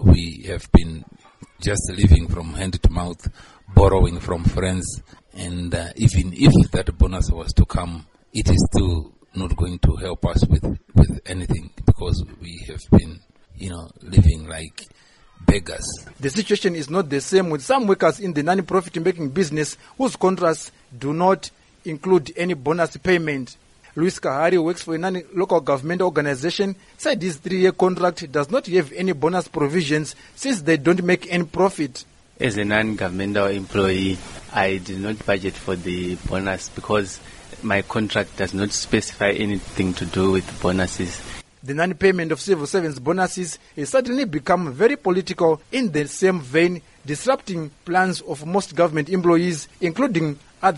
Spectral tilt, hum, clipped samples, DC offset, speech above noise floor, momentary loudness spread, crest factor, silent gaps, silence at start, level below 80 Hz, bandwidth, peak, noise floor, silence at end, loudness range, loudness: -6 dB/octave; none; under 0.1%; under 0.1%; 25 dB; 13 LU; 18 dB; none; 0 s; -30 dBFS; 11.5 kHz; -2 dBFS; -46 dBFS; 0 s; 3 LU; -21 LUFS